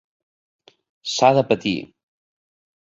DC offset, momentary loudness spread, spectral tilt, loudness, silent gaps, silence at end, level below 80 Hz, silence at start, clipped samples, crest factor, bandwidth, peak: under 0.1%; 13 LU; -4.5 dB/octave; -19 LUFS; none; 1.1 s; -62 dBFS; 1.05 s; under 0.1%; 22 dB; 8 kHz; -2 dBFS